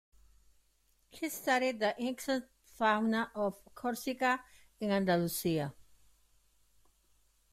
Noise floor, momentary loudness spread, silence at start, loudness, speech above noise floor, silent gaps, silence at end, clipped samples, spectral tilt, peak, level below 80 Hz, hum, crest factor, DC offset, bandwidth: -72 dBFS; 9 LU; 1.15 s; -34 LUFS; 39 dB; none; 1.7 s; under 0.1%; -4.5 dB/octave; -18 dBFS; -68 dBFS; none; 18 dB; under 0.1%; 16 kHz